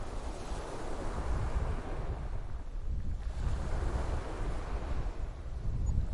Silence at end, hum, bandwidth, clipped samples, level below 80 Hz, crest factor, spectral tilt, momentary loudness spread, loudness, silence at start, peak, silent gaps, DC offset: 0 s; none; 11 kHz; under 0.1%; -36 dBFS; 18 dB; -6.5 dB/octave; 6 LU; -39 LUFS; 0 s; -16 dBFS; none; under 0.1%